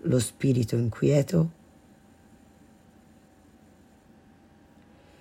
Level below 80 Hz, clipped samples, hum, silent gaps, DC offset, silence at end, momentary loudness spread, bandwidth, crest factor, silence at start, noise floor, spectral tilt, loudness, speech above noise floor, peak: -60 dBFS; under 0.1%; none; none; under 0.1%; 3.7 s; 4 LU; 16 kHz; 18 dB; 0.05 s; -56 dBFS; -7 dB/octave; -25 LUFS; 32 dB; -10 dBFS